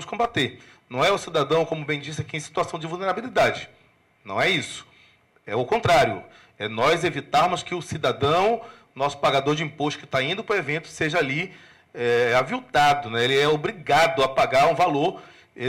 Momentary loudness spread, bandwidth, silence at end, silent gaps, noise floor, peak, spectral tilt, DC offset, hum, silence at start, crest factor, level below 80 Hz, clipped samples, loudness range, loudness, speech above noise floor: 11 LU; 16 kHz; 0 s; none; -57 dBFS; -12 dBFS; -4.5 dB/octave; under 0.1%; none; 0 s; 10 dB; -54 dBFS; under 0.1%; 5 LU; -23 LUFS; 35 dB